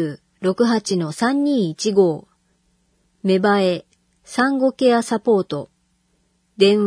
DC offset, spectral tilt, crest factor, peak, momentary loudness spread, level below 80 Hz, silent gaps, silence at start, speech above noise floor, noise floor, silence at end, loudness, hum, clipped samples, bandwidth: under 0.1%; -5.5 dB/octave; 18 dB; 0 dBFS; 11 LU; -66 dBFS; none; 0 s; 47 dB; -65 dBFS; 0 s; -19 LUFS; none; under 0.1%; 11 kHz